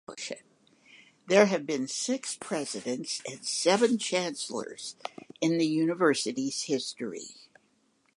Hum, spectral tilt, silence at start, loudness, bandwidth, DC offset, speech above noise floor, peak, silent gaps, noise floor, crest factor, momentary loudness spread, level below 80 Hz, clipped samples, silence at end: none; -3.5 dB/octave; 0.1 s; -29 LUFS; 11.5 kHz; under 0.1%; 41 dB; -6 dBFS; none; -70 dBFS; 24 dB; 15 LU; -82 dBFS; under 0.1%; 0.85 s